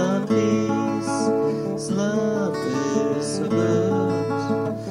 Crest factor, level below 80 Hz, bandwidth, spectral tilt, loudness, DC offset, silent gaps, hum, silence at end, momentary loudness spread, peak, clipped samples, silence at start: 14 dB; -58 dBFS; 12.5 kHz; -6 dB/octave; -23 LUFS; under 0.1%; none; none; 0 s; 4 LU; -8 dBFS; under 0.1%; 0 s